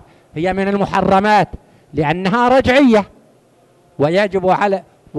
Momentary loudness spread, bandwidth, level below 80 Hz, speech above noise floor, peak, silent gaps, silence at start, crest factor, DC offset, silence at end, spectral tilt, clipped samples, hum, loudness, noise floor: 12 LU; 12 kHz; -42 dBFS; 38 dB; -4 dBFS; none; 0.35 s; 12 dB; under 0.1%; 0 s; -6.5 dB/octave; under 0.1%; none; -15 LUFS; -52 dBFS